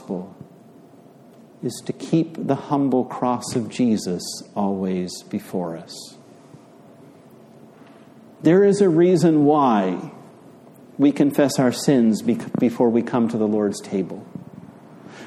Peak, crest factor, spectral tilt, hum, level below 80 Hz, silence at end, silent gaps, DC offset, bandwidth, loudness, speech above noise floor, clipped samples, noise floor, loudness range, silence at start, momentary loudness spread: -4 dBFS; 18 dB; -6.5 dB/octave; none; -66 dBFS; 0 s; none; under 0.1%; 14.5 kHz; -20 LUFS; 28 dB; under 0.1%; -47 dBFS; 10 LU; 0 s; 16 LU